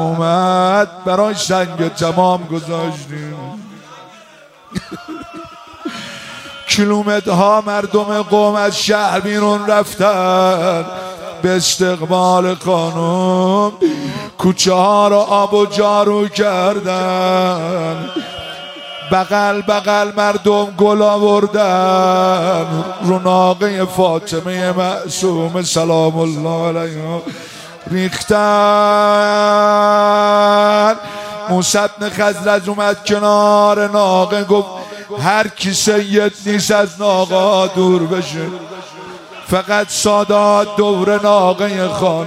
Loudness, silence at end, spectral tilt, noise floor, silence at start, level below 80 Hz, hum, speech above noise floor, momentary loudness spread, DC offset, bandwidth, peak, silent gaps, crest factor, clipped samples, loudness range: -14 LUFS; 0 s; -4.5 dB/octave; -42 dBFS; 0 s; -54 dBFS; none; 29 dB; 16 LU; under 0.1%; 16 kHz; 0 dBFS; none; 14 dB; under 0.1%; 5 LU